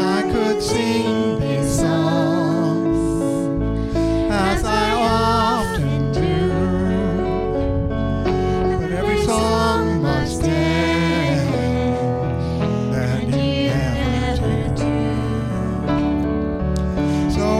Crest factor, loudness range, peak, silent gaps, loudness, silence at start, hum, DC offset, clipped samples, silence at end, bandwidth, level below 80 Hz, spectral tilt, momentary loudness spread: 12 dB; 2 LU; -6 dBFS; none; -19 LUFS; 0 s; none; under 0.1%; under 0.1%; 0 s; 15 kHz; -30 dBFS; -6.5 dB/octave; 4 LU